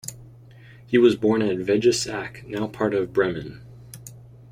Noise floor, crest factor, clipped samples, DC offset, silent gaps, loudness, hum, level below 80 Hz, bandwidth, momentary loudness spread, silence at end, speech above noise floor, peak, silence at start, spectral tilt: -47 dBFS; 20 dB; under 0.1%; under 0.1%; none; -22 LUFS; none; -54 dBFS; 15.5 kHz; 23 LU; 0.3 s; 25 dB; -4 dBFS; 0.05 s; -5 dB/octave